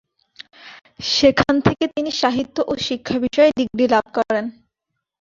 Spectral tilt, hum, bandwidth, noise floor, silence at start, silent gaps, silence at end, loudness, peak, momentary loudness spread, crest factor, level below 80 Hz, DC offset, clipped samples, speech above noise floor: -4.5 dB/octave; none; 7.6 kHz; -79 dBFS; 0.65 s; none; 0.7 s; -18 LUFS; 0 dBFS; 9 LU; 20 dB; -48 dBFS; under 0.1%; under 0.1%; 61 dB